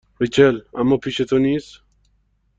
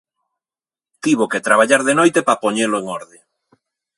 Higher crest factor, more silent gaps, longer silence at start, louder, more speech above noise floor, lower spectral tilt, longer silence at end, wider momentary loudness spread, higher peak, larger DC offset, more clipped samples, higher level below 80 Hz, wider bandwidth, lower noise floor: about the same, 18 dB vs 18 dB; neither; second, 0.2 s vs 1.05 s; about the same, -18 LUFS vs -16 LUFS; second, 45 dB vs over 74 dB; first, -6.5 dB/octave vs -3.5 dB/octave; about the same, 0.95 s vs 0.95 s; second, 6 LU vs 11 LU; about the same, -2 dBFS vs 0 dBFS; neither; neither; first, -50 dBFS vs -68 dBFS; second, 7.8 kHz vs 11.5 kHz; second, -63 dBFS vs under -90 dBFS